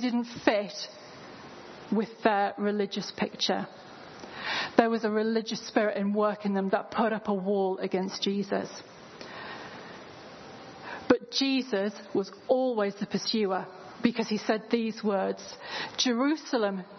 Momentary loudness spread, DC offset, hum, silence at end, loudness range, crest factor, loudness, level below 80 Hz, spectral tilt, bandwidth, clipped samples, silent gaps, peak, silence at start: 19 LU; under 0.1%; none; 0 s; 4 LU; 26 dB; -29 LUFS; -72 dBFS; -4.5 dB/octave; 6.4 kHz; under 0.1%; none; -4 dBFS; 0 s